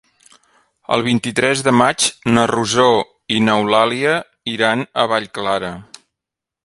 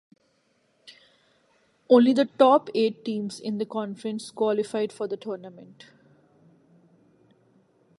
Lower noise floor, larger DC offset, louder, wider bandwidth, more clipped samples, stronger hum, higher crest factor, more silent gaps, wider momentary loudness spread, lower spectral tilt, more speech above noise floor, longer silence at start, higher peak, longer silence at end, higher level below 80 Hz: first, -84 dBFS vs -68 dBFS; neither; first, -16 LUFS vs -24 LUFS; about the same, 11.5 kHz vs 11.5 kHz; neither; neither; second, 18 dB vs 24 dB; neither; second, 7 LU vs 15 LU; second, -4 dB/octave vs -6 dB/octave; first, 68 dB vs 44 dB; second, 0.9 s vs 1.9 s; first, 0 dBFS vs -4 dBFS; second, 0.8 s vs 2.35 s; first, -54 dBFS vs -80 dBFS